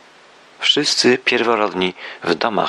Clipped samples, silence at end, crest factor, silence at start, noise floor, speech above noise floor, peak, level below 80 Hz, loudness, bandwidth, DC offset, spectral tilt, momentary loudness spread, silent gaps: under 0.1%; 0 s; 18 dB; 0.6 s; -47 dBFS; 29 dB; -2 dBFS; -64 dBFS; -17 LUFS; 12 kHz; under 0.1%; -2.5 dB/octave; 8 LU; none